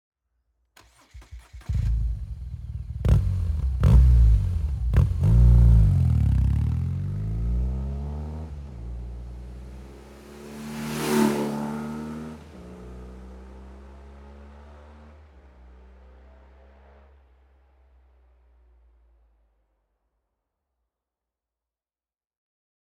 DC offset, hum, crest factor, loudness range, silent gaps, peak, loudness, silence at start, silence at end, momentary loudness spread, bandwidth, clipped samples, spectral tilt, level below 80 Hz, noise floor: under 0.1%; none; 20 dB; 18 LU; none; -6 dBFS; -23 LUFS; 1.15 s; 8.1 s; 27 LU; 13.5 kHz; under 0.1%; -7.5 dB/octave; -28 dBFS; under -90 dBFS